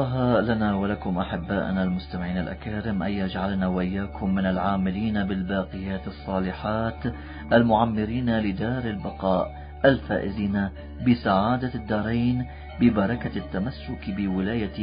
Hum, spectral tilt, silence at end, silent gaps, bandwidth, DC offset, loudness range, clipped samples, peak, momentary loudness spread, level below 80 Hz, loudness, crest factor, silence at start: none; -11.5 dB/octave; 0 s; none; 5.2 kHz; under 0.1%; 3 LU; under 0.1%; -6 dBFS; 9 LU; -40 dBFS; -26 LUFS; 20 dB; 0 s